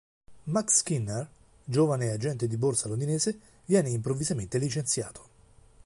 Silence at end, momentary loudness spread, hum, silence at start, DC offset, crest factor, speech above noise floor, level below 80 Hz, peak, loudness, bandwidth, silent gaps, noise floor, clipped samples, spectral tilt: 0.65 s; 13 LU; none; 0.3 s; under 0.1%; 18 dB; 29 dB; -58 dBFS; -10 dBFS; -28 LUFS; 11.5 kHz; none; -57 dBFS; under 0.1%; -5 dB/octave